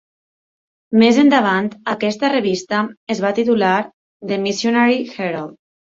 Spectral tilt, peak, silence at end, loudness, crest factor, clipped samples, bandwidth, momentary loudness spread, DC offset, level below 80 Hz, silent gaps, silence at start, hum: -5 dB/octave; -2 dBFS; 0.45 s; -17 LUFS; 16 dB; under 0.1%; 7.8 kHz; 11 LU; under 0.1%; -62 dBFS; 2.97-3.07 s, 3.94-4.20 s; 0.9 s; none